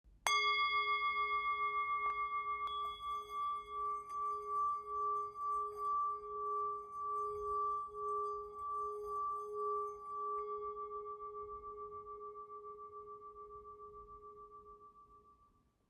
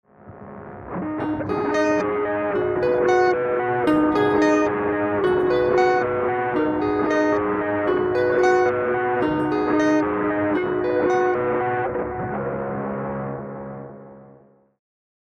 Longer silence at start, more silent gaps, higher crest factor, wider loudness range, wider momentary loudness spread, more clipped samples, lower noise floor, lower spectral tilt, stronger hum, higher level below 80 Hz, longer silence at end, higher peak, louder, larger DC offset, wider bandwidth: second, 0.05 s vs 0.25 s; neither; first, 26 dB vs 16 dB; first, 14 LU vs 5 LU; first, 18 LU vs 11 LU; neither; first, -72 dBFS vs -52 dBFS; second, -1 dB/octave vs -6.5 dB/octave; neither; second, -70 dBFS vs -50 dBFS; second, 0.55 s vs 1.1 s; second, -14 dBFS vs -6 dBFS; second, -39 LUFS vs -21 LUFS; neither; first, 14 kHz vs 8.6 kHz